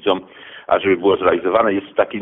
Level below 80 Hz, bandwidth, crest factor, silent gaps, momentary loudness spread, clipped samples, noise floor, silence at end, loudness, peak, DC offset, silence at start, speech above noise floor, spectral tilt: -54 dBFS; 4 kHz; 14 dB; none; 10 LU; under 0.1%; -39 dBFS; 0 s; -17 LUFS; -4 dBFS; under 0.1%; 0.05 s; 23 dB; -8.5 dB/octave